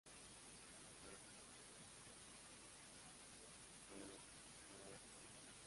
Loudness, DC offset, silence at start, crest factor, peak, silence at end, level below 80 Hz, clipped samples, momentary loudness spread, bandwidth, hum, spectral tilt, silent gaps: -59 LUFS; under 0.1%; 0.05 s; 18 dB; -42 dBFS; 0 s; -78 dBFS; under 0.1%; 2 LU; 11.5 kHz; none; -2 dB/octave; none